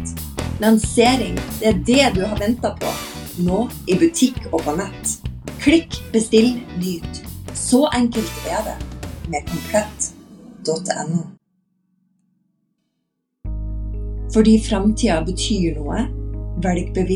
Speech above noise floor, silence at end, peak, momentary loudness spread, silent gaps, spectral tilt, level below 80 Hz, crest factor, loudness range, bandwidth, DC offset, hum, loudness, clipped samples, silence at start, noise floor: 56 dB; 0 s; -2 dBFS; 14 LU; none; -5 dB/octave; -32 dBFS; 18 dB; 10 LU; 19 kHz; under 0.1%; none; -20 LUFS; under 0.1%; 0 s; -74 dBFS